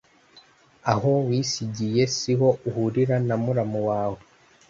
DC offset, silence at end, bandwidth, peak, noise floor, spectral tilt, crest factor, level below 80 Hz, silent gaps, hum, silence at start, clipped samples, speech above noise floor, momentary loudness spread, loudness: under 0.1%; 0.5 s; 7.8 kHz; -4 dBFS; -55 dBFS; -6 dB/octave; 20 dB; -58 dBFS; none; none; 0.85 s; under 0.1%; 32 dB; 6 LU; -24 LUFS